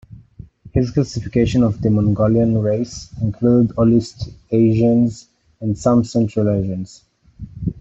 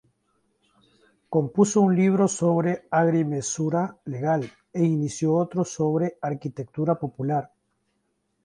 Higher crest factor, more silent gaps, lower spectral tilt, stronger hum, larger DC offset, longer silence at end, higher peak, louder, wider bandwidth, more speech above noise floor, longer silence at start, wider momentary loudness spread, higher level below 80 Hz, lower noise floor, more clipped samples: about the same, 14 dB vs 18 dB; neither; first, -8 dB/octave vs -6.5 dB/octave; neither; neither; second, 0 s vs 1 s; about the same, -4 dBFS vs -6 dBFS; first, -17 LUFS vs -24 LUFS; second, 8 kHz vs 11 kHz; second, 25 dB vs 50 dB; second, 0.1 s vs 1.3 s; first, 13 LU vs 10 LU; first, -40 dBFS vs -66 dBFS; second, -41 dBFS vs -73 dBFS; neither